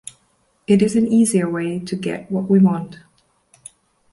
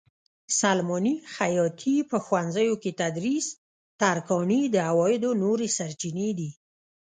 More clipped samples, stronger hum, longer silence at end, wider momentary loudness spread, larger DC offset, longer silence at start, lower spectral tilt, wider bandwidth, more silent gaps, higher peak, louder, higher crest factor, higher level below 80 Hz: neither; neither; first, 1.2 s vs 0.65 s; first, 15 LU vs 6 LU; neither; first, 0.7 s vs 0.5 s; first, -6.5 dB/octave vs -4.5 dB/octave; first, 11.5 kHz vs 9.6 kHz; second, none vs 3.58-3.99 s; first, -2 dBFS vs -8 dBFS; first, -18 LUFS vs -26 LUFS; about the same, 16 dB vs 18 dB; first, -58 dBFS vs -70 dBFS